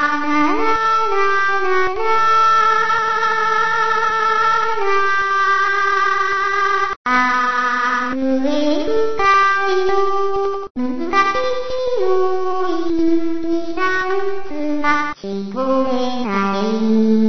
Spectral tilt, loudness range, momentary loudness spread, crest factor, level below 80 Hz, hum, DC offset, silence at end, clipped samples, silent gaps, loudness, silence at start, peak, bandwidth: -4.5 dB/octave; 4 LU; 7 LU; 14 dB; -46 dBFS; none; 6%; 0 s; under 0.1%; 6.96-7.05 s, 10.70-10.75 s; -17 LUFS; 0 s; -2 dBFS; 6.4 kHz